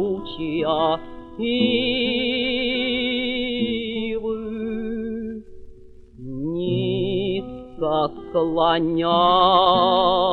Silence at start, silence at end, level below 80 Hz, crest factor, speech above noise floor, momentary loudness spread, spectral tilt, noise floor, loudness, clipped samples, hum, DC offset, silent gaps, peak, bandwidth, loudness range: 0 s; 0 s; -46 dBFS; 18 dB; 24 dB; 12 LU; -8 dB/octave; -43 dBFS; -21 LUFS; under 0.1%; none; under 0.1%; none; -2 dBFS; 4.7 kHz; 8 LU